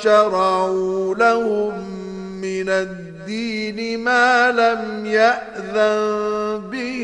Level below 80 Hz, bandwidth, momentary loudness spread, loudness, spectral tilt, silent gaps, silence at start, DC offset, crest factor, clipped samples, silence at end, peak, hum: -54 dBFS; 10.5 kHz; 14 LU; -19 LUFS; -4.5 dB/octave; none; 0 s; under 0.1%; 18 dB; under 0.1%; 0 s; -2 dBFS; none